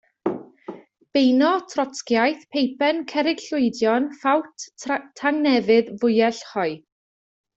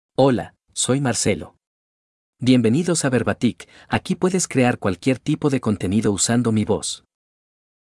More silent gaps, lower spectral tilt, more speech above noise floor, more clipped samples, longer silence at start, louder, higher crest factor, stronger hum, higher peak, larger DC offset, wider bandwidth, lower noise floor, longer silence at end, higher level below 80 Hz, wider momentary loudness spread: second, none vs 1.67-2.33 s; about the same, -4.5 dB/octave vs -5 dB/octave; second, 19 dB vs over 70 dB; neither; about the same, 0.25 s vs 0.2 s; about the same, -22 LUFS vs -20 LUFS; about the same, 16 dB vs 18 dB; neither; second, -6 dBFS vs -2 dBFS; neither; second, 8 kHz vs 12 kHz; second, -40 dBFS vs under -90 dBFS; about the same, 0.8 s vs 0.85 s; second, -68 dBFS vs -54 dBFS; first, 13 LU vs 8 LU